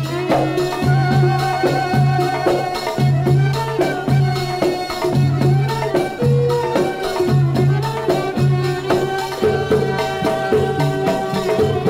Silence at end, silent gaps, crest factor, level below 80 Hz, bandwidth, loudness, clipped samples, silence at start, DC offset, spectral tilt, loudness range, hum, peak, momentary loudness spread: 0 s; none; 14 dB; -42 dBFS; 15.5 kHz; -17 LUFS; under 0.1%; 0 s; under 0.1%; -7 dB/octave; 1 LU; none; -4 dBFS; 4 LU